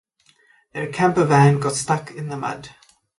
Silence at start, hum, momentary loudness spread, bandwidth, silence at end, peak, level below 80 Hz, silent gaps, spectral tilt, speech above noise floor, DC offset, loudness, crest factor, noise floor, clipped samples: 0.75 s; none; 16 LU; 11.5 kHz; 0.5 s; -4 dBFS; -56 dBFS; none; -6 dB/octave; 39 dB; under 0.1%; -20 LUFS; 18 dB; -59 dBFS; under 0.1%